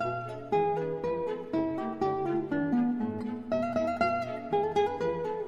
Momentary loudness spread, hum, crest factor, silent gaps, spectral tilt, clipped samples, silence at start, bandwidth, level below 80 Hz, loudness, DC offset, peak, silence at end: 5 LU; none; 16 dB; none; -7.5 dB/octave; under 0.1%; 0 s; 8.8 kHz; -64 dBFS; -31 LUFS; 0.2%; -14 dBFS; 0 s